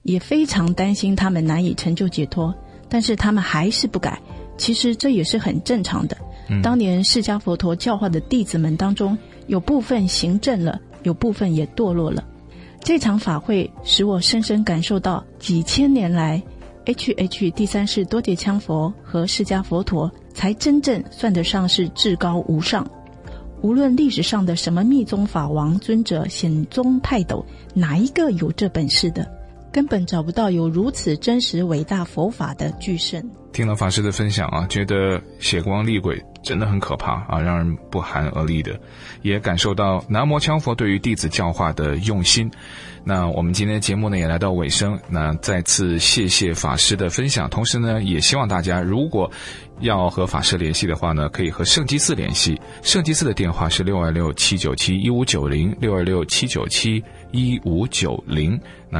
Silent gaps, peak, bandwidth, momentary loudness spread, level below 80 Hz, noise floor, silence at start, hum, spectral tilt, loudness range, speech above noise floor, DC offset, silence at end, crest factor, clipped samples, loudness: none; -2 dBFS; 11.5 kHz; 8 LU; -38 dBFS; -41 dBFS; 0.05 s; none; -4.5 dB/octave; 3 LU; 21 dB; under 0.1%; 0 s; 18 dB; under 0.1%; -20 LUFS